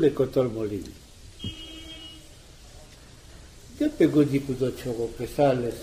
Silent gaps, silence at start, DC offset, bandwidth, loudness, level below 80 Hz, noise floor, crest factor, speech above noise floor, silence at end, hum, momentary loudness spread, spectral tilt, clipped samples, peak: none; 0 s; under 0.1%; 15.5 kHz; -26 LUFS; -48 dBFS; -48 dBFS; 18 dB; 24 dB; 0 s; none; 24 LU; -7 dB/octave; under 0.1%; -8 dBFS